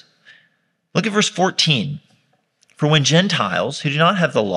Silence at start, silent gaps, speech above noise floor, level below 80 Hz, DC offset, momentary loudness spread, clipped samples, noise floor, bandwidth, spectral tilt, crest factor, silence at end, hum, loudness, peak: 0.95 s; none; 48 dB; -66 dBFS; under 0.1%; 9 LU; under 0.1%; -65 dBFS; 11 kHz; -4 dB/octave; 18 dB; 0 s; none; -17 LUFS; 0 dBFS